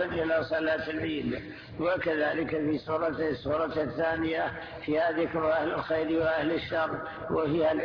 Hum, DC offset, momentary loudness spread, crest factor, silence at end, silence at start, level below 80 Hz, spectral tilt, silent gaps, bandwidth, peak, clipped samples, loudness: none; under 0.1%; 5 LU; 12 dB; 0 s; 0 s; -54 dBFS; -8 dB/octave; none; 5.4 kHz; -16 dBFS; under 0.1%; -29 LUFS